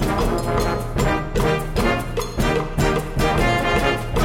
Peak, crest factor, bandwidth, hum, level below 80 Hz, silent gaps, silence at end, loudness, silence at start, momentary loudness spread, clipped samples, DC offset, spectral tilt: -6 dBFS; 14 dB; 17 kHz; none; -26 dBFS; none; 0 s; -21 LUFS; 0 s; 4 LU; under 0.1%; under 0.1%; -5.5 dB/octave